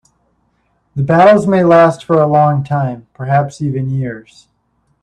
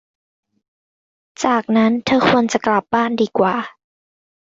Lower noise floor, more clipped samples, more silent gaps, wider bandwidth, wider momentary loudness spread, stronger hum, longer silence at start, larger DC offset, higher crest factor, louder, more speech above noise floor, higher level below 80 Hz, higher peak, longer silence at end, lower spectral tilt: second, -61 dBFS vs under -90 dBFS; neither; neither; first, 9.8 kHz vs 7.8 kHz; first, 15 LU vs 6 LU; neither; second, 0.95 s vs 1.4 s; neither; about the same, 14 dB vs 16 dB; first, -12 LUFS vs -17 LUFS; second, 49 dB vs over 74 dB; first, -50 dBFS vs -56 dBFS; about the same, 0 dBFS vs -2 dBFS; about the same, 0.8 s vs 0.8 s; first, -8 dB/octave vs -5 dB/octave